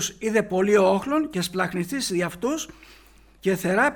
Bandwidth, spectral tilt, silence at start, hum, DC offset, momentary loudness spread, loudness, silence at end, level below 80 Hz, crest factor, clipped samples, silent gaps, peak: 20 kHz; -4.5 dB/octave; 0 s; none; under 0.1%; 9 LU; -24 LUFS; 0 s; -54 dBFS; 16 dB; under 0.1%; none; -8 dBFS